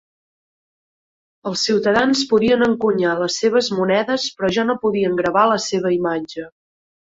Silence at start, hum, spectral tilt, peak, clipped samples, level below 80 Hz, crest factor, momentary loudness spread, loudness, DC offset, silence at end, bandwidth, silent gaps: 1.45 s; none; -4 dB/octave; -2 dBFS; under 0.1%; -56 dBFS; 16 dB; 9 LU; -18 LUFS; under 0.1%; 0.55 s; 8 kHz; none